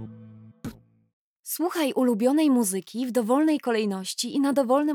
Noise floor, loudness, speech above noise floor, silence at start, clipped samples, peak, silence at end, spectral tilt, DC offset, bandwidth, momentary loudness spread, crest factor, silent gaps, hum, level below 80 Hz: -47 dBFS; -24 LUFS; 24 dB; 0 s; under 0.1%; -10 dBFS; 0 s; -4.5 dB/octave; under 0.1%; 19.5 kHz; 19 LU; 14 dB; 1.13-1.43 s; none; -66 dBFS